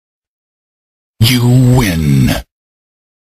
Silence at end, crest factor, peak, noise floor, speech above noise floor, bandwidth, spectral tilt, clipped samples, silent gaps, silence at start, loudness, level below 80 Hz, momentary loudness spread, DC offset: 0.95 s; 14 dB; 0 dBFS; under -90 dBFS; over 81 dB; 15.5 kHz; -6 dB/octave; under 0.1%; none; 1.2 s; -11 LUFS; -28 dBFS; 6 LU; under 0.1%